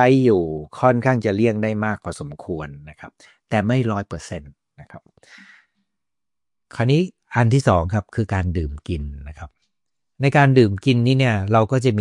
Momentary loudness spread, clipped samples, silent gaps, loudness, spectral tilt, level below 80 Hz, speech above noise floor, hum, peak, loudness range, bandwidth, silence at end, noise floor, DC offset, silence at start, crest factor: 17 LU; under 0.1%; none; -19 LUFS; -7.5 dB/octave; -44 dBFS; 70 dB; none; -2 dBFS; 8 LU; 11 kHz; 0 s; -89 dBFS; under 0.1%; 0 s; 18 dB